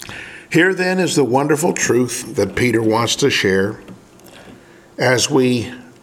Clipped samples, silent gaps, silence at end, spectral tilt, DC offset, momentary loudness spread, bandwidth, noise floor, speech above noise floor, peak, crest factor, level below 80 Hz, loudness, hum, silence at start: under 0.1%; none; 0.15 s; -4 dB/octave; under 0.1%; 11 LU; 17 kHz; -43 dBFS; 27 dB; 0 dBFS; 18 dB; -52 dBFS; -16 LUFS; none; 0 s